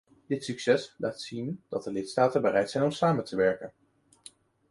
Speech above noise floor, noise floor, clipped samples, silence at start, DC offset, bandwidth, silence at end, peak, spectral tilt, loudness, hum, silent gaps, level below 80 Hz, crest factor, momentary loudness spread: 27 dB; -55 dBFS; under 0.1%; 0.3 s; under 0.1%; 11.5 kHz; 1 s; -10 dBFS; -5.5 dB/octave; -29 LUFS; none; none; -66 dBFS; 20 dB; 10 LU